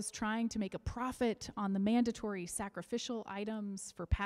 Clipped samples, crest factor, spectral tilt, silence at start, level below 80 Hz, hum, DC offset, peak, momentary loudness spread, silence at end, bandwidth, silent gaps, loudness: under 0.1%; 18 dB; -5 dB/octave; 0 s; -50 dBFS; none; under 0.1%; -20 dBFS; 9 LU; 0 s; 14 kHz; none; -38 LUFS